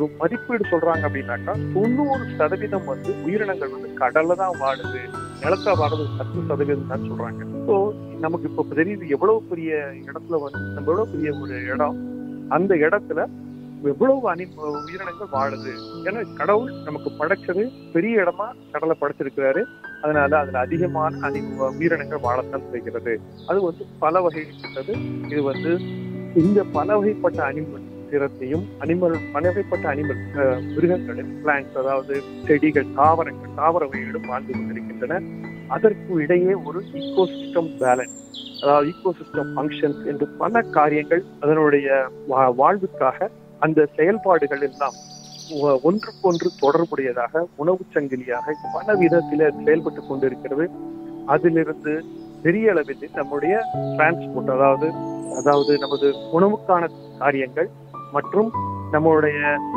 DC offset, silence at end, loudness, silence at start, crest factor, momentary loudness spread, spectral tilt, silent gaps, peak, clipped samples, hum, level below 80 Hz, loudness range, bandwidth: under 0.1%; 0 s; -22 LUFS; 0 s; 20 dB; 11 LU; -7 dB/octave; none; -2 dBFS; under 0.1%; none; -60 dBFS; 4 LU; 9.4 kHz